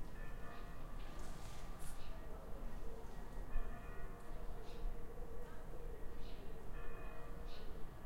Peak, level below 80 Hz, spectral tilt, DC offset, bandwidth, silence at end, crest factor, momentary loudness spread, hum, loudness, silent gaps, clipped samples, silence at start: -26 dBFS; -48 dBFS; -5.5 dB/octave; under 0.1%; 15 kHz; 0 s; 16 dB; 3 LU; none; -54 LUFS; none; under 0.1%; 0 s